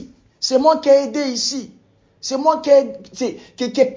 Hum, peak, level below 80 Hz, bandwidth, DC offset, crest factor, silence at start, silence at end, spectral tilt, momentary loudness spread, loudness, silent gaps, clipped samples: none; -2 dBFS; -62 dBFS; 7.6 kHz; under 0.1%; 16 dB; 0 s; 0 s; -3 dB/octave; 12 LU; -17 LUFS; none; under 0.1%